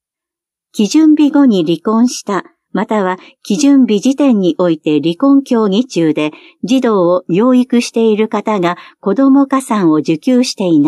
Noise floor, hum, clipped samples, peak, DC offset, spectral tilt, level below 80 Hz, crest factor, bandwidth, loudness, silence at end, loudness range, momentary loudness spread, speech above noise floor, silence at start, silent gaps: -84 dBFS; none; under 0.1%; -2 dBFS; under 0.1%; -5.5 dB/octave; -70 dBFS; 10 dB; 12.5 kHz; -12 LUFS; 0 s; 1 LU; 10 LU; 73 dB; 0.75 s; none